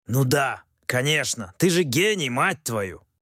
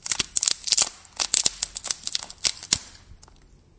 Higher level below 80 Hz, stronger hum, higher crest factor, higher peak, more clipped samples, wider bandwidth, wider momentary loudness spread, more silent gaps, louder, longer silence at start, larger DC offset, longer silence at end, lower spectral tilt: second, -60 dBFS vs -54 dBFS; neither; second, 16 dB vs 28 dB; second, -8 dBFS vs 0 dBFS; neither; first, 16.5 kHz vs 8 kHz; about the same, 8 LU vs 8 LU; neither; about the same, -23 LUFS vs -23 LUFS; about the same, 0.1 s vs 0.05 s; neither; second, 0.25 s vs 0.65 s; first, -4 dB/octave vs 1 dB/octave